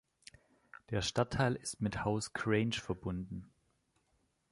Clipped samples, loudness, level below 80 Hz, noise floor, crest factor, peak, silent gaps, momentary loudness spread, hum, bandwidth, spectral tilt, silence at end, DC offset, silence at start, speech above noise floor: under 0.1%; -36 LUFS; -58 dBFS; -77 dBFS; 20 dB; -16 dBFS; none; 9 LU; none; 11.5 kHz; -5 dB/octave; 1.05 s; under 0.1%; 0.9 s; 42 dB